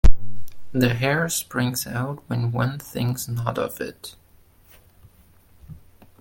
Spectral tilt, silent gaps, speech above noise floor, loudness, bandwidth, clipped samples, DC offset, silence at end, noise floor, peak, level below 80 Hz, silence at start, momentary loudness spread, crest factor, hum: -5 dB/octave; none; 29 dB; -25 LUFS; 17 kHz; 0.1%; under 0.1%; 0.5 s; -54 dBFS; 0 dBFS; -28 dBFS; 0.05 s; 23 LU; 20 dB; none